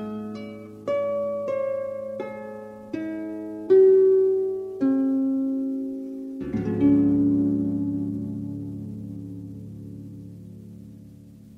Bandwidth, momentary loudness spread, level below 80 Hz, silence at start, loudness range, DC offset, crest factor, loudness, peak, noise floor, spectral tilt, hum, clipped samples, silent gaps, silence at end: 5.4 kHz; 20 LU; -56 dBFS; 0 s; 11 LU; under 0.1%; 16 dB; -24 LUFS; -8 dBFS; -46 dBFS; -10 dB/octave; none; under 0.1%; none; 0 s